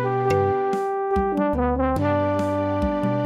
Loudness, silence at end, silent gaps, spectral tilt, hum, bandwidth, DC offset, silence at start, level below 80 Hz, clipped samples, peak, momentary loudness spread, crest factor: -22 LUFS; 0 s; none; -8 dB/octave; none; 13 kHz; under 0.1%; 0 s; -36 dBFS; under 0.1%; -10 dBFS; 3 LU; 12 dB